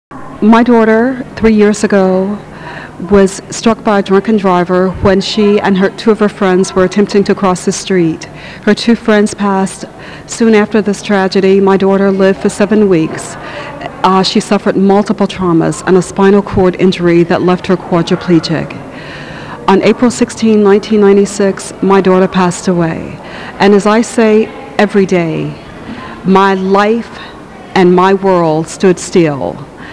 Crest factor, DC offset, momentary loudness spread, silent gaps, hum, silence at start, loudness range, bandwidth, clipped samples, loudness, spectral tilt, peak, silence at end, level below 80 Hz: 10 dB; 0.4%; 15 LU; none; none; 0.1 s; 2 LU; 11 kHz; 0.3%; -10 LUFS; -6 dB/octave; 0 dBFS; 0 s; -38 dBFS